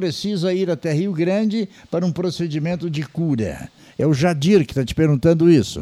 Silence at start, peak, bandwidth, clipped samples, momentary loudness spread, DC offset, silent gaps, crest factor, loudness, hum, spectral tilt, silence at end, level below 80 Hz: 0 s; -4 dBFS; 13.5 kHz; under 0.1%; 10 LU; under 0.1%; none; 14 dB; -19 LUFS; none; -7 dB/octave; 0 s; -46 dBFS